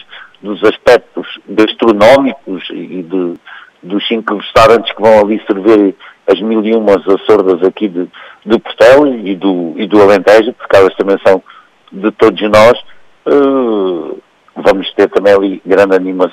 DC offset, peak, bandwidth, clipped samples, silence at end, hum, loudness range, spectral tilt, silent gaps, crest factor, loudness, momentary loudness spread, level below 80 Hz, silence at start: under 0.1%; 0 dBFS; 14.5 kHz; 0.3%; 0 s; none; 3 LU; -5.5 dB/octave; none; 10 dB; -9 LUFS; 15 LU; -42 dBFS; 0.15 s